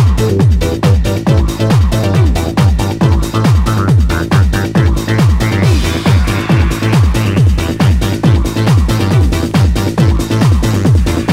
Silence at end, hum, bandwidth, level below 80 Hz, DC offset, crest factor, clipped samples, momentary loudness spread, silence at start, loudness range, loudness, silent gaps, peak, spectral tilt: 0 s; none; 16 kHz; -16 dBFS; under 0.1%; 10 dB; under 0.1%; 1 LU; 0 s; 0 LU; -11 LUFS; none; 0 dBFS; -6.5 dB/octave